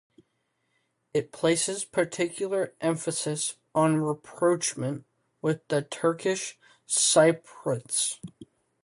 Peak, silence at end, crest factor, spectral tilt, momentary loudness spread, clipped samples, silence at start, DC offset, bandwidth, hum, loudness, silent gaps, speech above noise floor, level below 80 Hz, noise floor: -8 dBFS; 0.4 s; 20 dB; -3.5 dB/octave; 10 LU; under 0.1%; 1.15 s; under 0.1%; 11.5 kHz; none; -27 LUFS; none; 49 dB; -72 dBFS; -76 dBFS